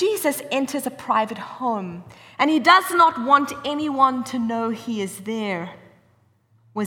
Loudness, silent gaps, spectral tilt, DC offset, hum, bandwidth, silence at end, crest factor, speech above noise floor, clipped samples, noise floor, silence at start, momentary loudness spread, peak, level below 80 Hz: -21 LUFS; none; -4 dB/octave; under 0.1%; none; over 20 kHz; 0 s; 18 dB; 39 dB; under 0.1%; -60 dBFS; 0 s; 14 LU; -4 dBFS; -68 dBFS